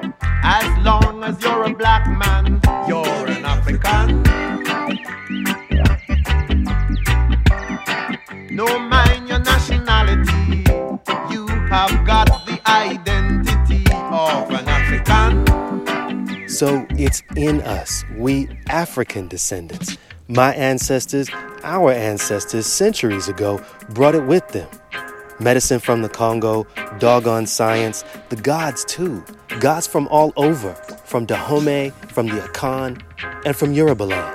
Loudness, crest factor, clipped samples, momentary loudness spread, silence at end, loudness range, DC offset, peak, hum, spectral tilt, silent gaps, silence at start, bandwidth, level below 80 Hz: -18 LUFS; 16 dB; under 0.1%; 10 LU; 0 s; 4 LU; under 0.1%; 0 dBFS; none; -5 dB/octave; none; 0 s; 16.5 kHz; -22 dBFS